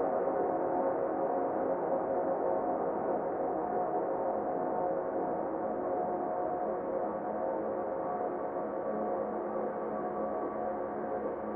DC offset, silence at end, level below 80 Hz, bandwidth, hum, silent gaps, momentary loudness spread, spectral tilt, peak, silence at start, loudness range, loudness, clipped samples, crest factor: under 0.1%; 0 s; -66 dBFS; 3 kHz; none; none; 4 LU; -11 dB/octave; -20 dBFS; 0 s; 3 LU; -34 LUFS; under 0.1%; 14 dB